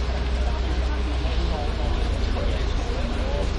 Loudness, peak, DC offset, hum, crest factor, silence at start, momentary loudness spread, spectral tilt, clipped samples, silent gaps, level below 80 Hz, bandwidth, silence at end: -26 LUFS; -12 dBFS; under 0.1%; none; 12 dB; 0 s; 1 LU; -6 dB/octave; under 0.1%; none; -24 dBFS; 9.4 kHz; 0 s